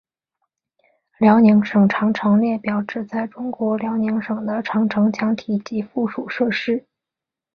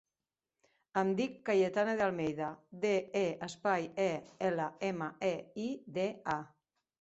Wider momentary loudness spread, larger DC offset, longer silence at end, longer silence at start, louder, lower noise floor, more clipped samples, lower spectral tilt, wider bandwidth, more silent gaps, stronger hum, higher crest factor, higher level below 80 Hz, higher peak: first, 11 LU vs 8 LU; neither; first, 0.75 s vs 0.55 s; first, 1.2 s vs 0.95 s; first, -19 LUFS vs -35 LUFS; about the same, -87 dBFS vs under -90 dBFS; neither; first, -8 dB/octave vs -4.5 dB/octave; second, 6.4 kHz vs 8 kHz; neither; neither; about the same, 18 dB vs 18 dB; first, -62 dBFS vs -74 dBFS; first, -2 dBFS vs -18 dBFS